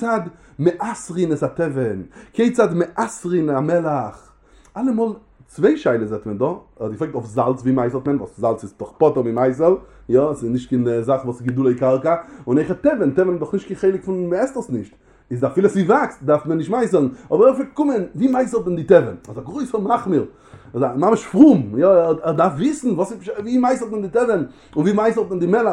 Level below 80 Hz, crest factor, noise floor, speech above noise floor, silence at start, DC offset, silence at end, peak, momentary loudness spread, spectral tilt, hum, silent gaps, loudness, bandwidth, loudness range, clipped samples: -52 dBFS; 18 dB; -50 dBFS; 32 dB; 0 s; under 0.1%; 0 s; 0 dBFS; 11 LU; -7.5 dB/octave; none; none; -19 LUFS; 11 kHz; 5 LU; under 0.1%